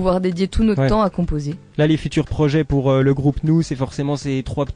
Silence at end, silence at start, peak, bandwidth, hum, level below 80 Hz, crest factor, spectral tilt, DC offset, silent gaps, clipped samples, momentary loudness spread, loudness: 0 s; 0 s; -4 dBFS; 10 kHz; none; -32 dBFS; 14 dB; -7.5 dB/octave; under 0.1%; none; under 0.1%; 7 LU; -19 LUFS